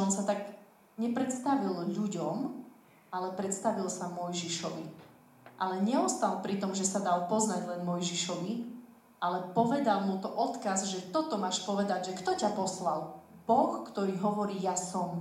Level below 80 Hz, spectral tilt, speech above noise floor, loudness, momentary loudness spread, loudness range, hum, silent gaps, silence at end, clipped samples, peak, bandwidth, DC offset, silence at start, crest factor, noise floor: -78 dBFS; -4.5 dB/octave; 25 dB; -32 LUFS; 9 LU; 4 LU; none; none; 0 s; under 0.1%; -12 dBFS; 15.5 kHz; under 0.1%; 0 s; 20 dB; -57 dBFS